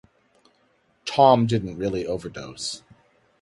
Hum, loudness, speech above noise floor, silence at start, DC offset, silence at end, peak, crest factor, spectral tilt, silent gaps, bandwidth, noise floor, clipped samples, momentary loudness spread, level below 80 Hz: none; -22 LUFS; 43 dB; 1.05 s; under 0.1%; 0.65 s; -4 dBFS; 22 dB; -5.5 dB/octave; none; 11.5 kHz; -65 dBFS; under 0.1%; 19 LU; -54 dBFS